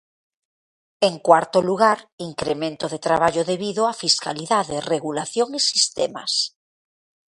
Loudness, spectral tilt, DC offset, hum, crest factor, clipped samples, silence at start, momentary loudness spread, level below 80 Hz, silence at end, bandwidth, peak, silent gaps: -21 LUFS; -3 dB/octave; under 0.1%; none; 22 dB; under 0.1%; 1 s; 9 LU; -60 dBFS; 0.9 s; 11.5 kHz; 0 dBFS; 2.12-2.18 s